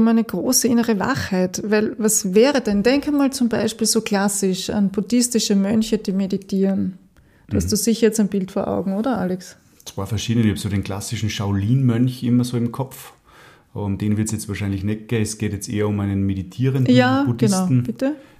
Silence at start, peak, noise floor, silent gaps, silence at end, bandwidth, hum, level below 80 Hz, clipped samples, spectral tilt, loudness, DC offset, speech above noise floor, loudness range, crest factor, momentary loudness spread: 0 s; -2 dBFS; -48 dBFS; none; 0.15 s; 15.5 kHz; none; -48 dBFS; under 0.1%; -5 dB/octave; -20 LUFS; under 0.1%; 29 dB; 5 LU; 18 dB; 9 LU